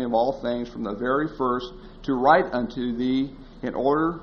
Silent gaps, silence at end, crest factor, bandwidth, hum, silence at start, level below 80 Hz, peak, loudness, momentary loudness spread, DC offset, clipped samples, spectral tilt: none; 0 s; 20 dB; 6.6 kHz; none; 0 s; -48 dBFS; -4 dBFS; -24 LUFS; 13 LU; under 0.1%; under 0.1%; -4.5 dB/octave